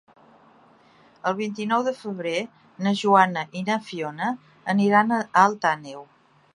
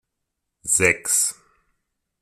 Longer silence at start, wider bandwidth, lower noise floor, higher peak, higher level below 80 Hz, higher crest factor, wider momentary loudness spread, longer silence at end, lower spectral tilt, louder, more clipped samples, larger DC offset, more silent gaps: first, 1.25 s vs 0.65 s; second, 11 kHz vs 15.5 kHz; second, -55 dBFS vs -80 dBFS; about the same, -2 dBFS vs -2 dBFS; second, -76 dBFS vs -58 dBFS; about the same, 22 dB vs 22 dB; first, 12 LU vs 8 LU; second, 0.5 s vs 0.9 s; first, -5.5 dB/octave vs -1.5 dB/octave; second, -23 LUFS vs -19 LUFS; neither; neither; neither